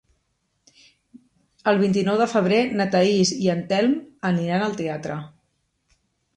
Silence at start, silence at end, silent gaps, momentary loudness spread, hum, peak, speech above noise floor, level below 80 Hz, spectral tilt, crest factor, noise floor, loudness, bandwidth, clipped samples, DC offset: 1.15 s; 1.1 s; none; 9 LU; none; -6 dBFS; 51 dB; -64 dBFS; -5.5 dB/octave; 18 dB; -72 dBFS; -21 LUFS; 9.8 kHz; under 0.1%; under 0.1%